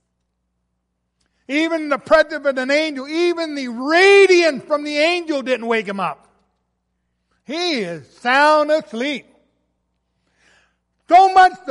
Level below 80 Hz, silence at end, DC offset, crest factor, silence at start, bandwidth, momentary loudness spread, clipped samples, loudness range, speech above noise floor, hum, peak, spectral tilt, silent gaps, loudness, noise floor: -58 dBFS; 0 s; under 0.1%; 16 dB; 1.5 s; 11.5 kHz; 14 LU; under 0.1%; 7 LU; 57 dB; none; -2 dBFS; -3.5 dB/octave; none; -16 LUFS; -73 dBFS